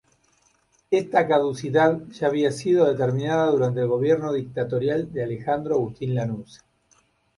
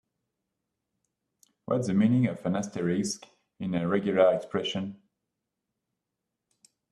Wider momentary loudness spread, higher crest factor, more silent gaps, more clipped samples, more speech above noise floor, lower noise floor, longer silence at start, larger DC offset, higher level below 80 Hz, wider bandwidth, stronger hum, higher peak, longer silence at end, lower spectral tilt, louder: second, 7 LU vs 14 LU; about the same, 18 dB vs 22 dB; neither; neither; second, 42 dB vs 59 dB; second, -64 dBFS vs -85 dBFS; second, 0.9 s vs 1.7 s; neither; first, -60 dBFS vs -68 dBFS; about the same, 11.5 kHz vs 12 kHz; neither; about the same, -6 dBFS vs -8 dBFS; second, 0.8 s vs 1.95 s; about the same, -7 dB/octave vs -6 dB/octave; first, -23 LUFS vs -28 LUFS